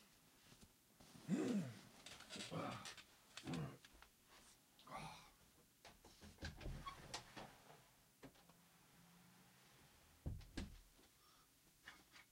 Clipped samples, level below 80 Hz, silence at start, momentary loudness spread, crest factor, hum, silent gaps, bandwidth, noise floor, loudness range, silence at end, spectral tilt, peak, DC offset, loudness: under 0.1%; -66 dBFS; 0 s; 20 LU; 24 dB; none; none; 16 kHz; -73 dBFS; 11 LU; 0 s; -5 dB/octave; -32 dBFS; under 0.1%; -52 LUFS